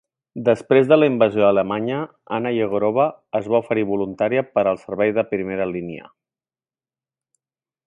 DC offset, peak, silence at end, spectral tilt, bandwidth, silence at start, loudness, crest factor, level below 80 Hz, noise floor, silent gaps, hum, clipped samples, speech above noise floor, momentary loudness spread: under 0.1%; 0 dBFS; 1.85 s; -8 dB/octave; 10 kHz; 0.35 s; -20 LUFS; 20 dB; -60 dBFS; under -90 dBFS; none; none; under 0.1%; over 71 dB; 11 LU